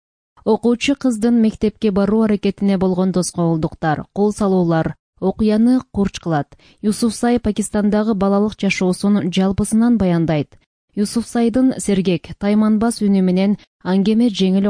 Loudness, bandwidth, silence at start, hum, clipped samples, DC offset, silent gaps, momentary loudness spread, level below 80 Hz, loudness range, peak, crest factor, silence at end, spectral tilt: -17 LUFS; 10.5 kHz; 0.45 s; none; under 0.1%; under 0.1%; 4.99-5.13 s, 10.66-10.88 s, 13.67-13.79 s; 6 LU; -42 dBFS; 2 LU; -4 dBFS; 12 dB; 0 s; -6.5 dB/octave